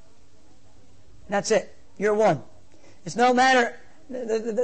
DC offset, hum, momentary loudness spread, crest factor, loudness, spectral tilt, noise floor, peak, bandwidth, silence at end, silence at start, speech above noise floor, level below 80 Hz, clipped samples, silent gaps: 0.9%; none; 17 LU; 16 dB; -23 LUFS; -4 dB/octave; -58 dBFS; -8 dBFS; 8.8 kHz; 0 s; 1.3 s; 36 dB; -62 dBFS; under 0.1%; none